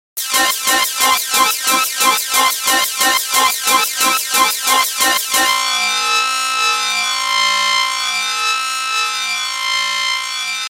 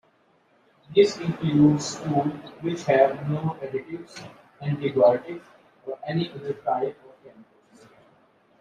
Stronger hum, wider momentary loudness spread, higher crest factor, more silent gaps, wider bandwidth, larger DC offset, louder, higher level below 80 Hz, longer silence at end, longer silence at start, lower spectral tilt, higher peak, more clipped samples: neither; second, 4 LU vs 18 LU; about the same, 16 dB vs 20 dB; neither; first, 17.5 kHz vs 11 kHz; neither; first, -14 LUFS vs -24 LUFS; first, -58 dBFS vs -64 dBFS; second, 0 s vs 1.2 s; second, 0.15 s vs 0.9 s; second, 2 dB/octave vs -6.5 dB/octave; first, 0 dBFS vs -4 dBFS; neither